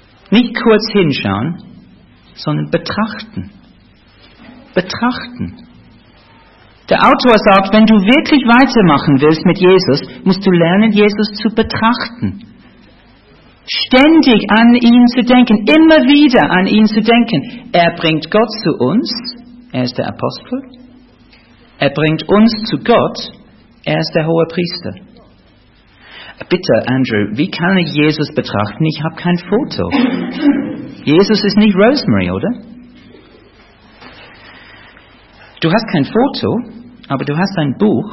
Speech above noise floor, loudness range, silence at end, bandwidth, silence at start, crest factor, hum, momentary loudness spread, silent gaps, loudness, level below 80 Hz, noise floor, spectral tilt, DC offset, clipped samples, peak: 35 dB; 12 LU; 0 s; 6 kHz; 0.3 s; 12 dB; none; 14 LU; none; -12 LUFS; -44 dBFS; -47 dBFS; -7.5 dB/octave; under 0.1%; under 0.1%; 0 dBFS